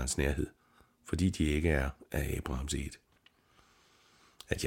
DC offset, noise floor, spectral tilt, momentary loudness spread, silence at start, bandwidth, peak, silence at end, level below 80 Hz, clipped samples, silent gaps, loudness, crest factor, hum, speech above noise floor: under 0.1%; -68 dBFS; -5 dB/octave; 16 LU; 0 s; 17 kHz; -14 dBFS; 0 s; -42 dBFS; under 0.1%; none; -34 LUFS; 22 dB; none; 35 dB